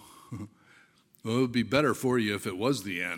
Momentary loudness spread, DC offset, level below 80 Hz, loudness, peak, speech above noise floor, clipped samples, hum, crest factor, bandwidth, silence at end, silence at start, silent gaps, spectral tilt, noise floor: 17 LU; under 0.1%; -64 dBFS; -28 LUFS; -8 dBFS; 33 dB; under 0.1%; none; 22 dB; 17 kHz; 0 s; 0 s; none; -5.5 dB/octave; -61 dBFS